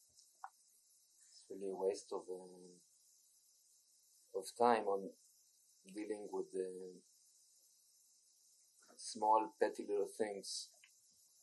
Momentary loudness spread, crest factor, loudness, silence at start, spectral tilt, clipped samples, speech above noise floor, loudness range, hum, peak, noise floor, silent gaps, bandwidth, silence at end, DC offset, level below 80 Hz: 23 LU; 26 dB; -41 LUFS; 0.45 s; -3.5 dB/octave; under 0.1%; 32 dB; 9 LU; none; -18 dBFS; -72 dBFS; none; 12 kHz; 0.75 s; under 0.1%; under -90 dBFS